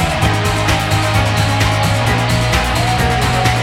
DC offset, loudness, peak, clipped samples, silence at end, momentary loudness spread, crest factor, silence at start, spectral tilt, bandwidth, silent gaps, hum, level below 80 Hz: under 0.1%; -14 LUFS; -2 dBFS; under 0.1%; 0 s; 1 LU; 12 dB; 0 s; -4.5 dB/octave; 16.5 kHz; none; none; -24 dBFS